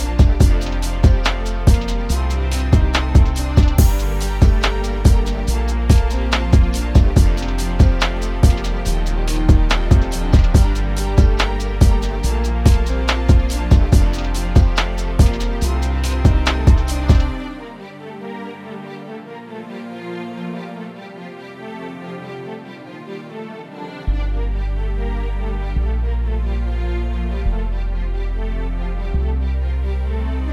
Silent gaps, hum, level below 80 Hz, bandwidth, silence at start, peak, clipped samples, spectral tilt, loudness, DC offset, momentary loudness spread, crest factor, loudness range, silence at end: none; none; -18 dBFS; 14.5 kHz; 0 s; 0 dBFS; under 0.1%; -6 dB/octave; -18 LUFS; under 0.1%; 17 LU; 16 dB; 14 LU; 0 s